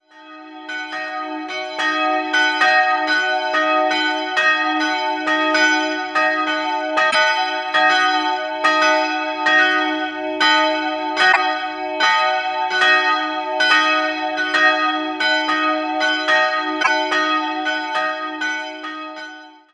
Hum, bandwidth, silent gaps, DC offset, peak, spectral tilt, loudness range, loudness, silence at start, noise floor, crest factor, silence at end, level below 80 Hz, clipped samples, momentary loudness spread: none; 11 kHz; none; under 0.1%; -2 dBFS; -1 dB/octave; 2 LU; -17 LUFS; 0.15 s; -40 dBFS; 16 dB; 0.25 s; -68 dBFS; under 0.1%; 11 LU